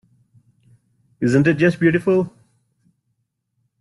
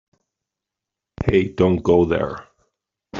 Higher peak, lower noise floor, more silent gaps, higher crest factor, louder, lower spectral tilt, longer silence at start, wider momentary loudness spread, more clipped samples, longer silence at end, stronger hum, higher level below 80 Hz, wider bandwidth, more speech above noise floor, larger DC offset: about the same, -4 dBFS vs -2 dBFS; second, -72 dBFS vs -85 dBFS; neither; about the same, 18 dB vs 18 dB; about the same, -18 LUFS vs -19 LUFS; about the same, -8 dB/octave vs -7 dB/octave; about the same, 1.2 s vs 1.2 s; second, 7 LU vs 11 LU; neither; first, 1.5 s vs 0 s; neither; second, -58 dBFS vs -44 dBFS; first, 11.5 kHz vs 7.2 kHz; second, 56 dB vs 68 dB; neither